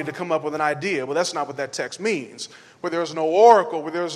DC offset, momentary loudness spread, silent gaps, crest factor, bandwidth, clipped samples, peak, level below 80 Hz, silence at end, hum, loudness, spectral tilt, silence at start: under 0.1%; 15 LU; none; 20 dB; 12 kHz; under 0.1%; -2 dBFS; -76 dBFS; 0 s; none; -21 LUFS; -4 dB/octave; 0 s